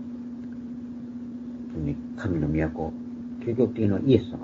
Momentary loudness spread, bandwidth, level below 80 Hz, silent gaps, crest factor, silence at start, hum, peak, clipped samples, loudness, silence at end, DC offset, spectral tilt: 14 LU; 7.4 kHz; -46 dBFS; none; 24 dB; 0 s; none; -4 dBFS; under 0.1%; -29 LUFS; 0 s; under 0.1%; -9.5 dB/octave